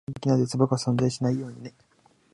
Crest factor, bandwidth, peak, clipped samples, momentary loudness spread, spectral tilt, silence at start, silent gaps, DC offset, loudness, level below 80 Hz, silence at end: 18 dB; 11.5 kHz; -8 dBFS; under 0.1%; 17 LU; -7 dB/octave; 0.1 s; none; under 0.1%; -25 LUFS; -60 dBFS; 0.65 s